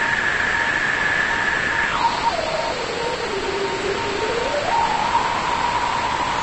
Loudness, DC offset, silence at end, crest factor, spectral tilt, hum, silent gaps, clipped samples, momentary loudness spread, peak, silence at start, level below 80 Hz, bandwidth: -20 LUFS; under 0.1%; 0 s; 14 dB; -3 dB/octave; none; none; under 0.1%; 5 LU; -8 dBFS; 0 s; -42 dBFS; 11 kHz